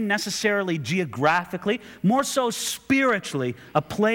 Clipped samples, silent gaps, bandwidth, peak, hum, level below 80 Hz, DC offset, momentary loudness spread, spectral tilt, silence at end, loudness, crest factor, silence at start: under 0.1%; none; 19.5 kHz; -6 dBFS; none; -62 dBFS; under 0.1%; 6 LU; -4.5 dB/octave; 0 s; -24 LUFS; 18 dB; 0 s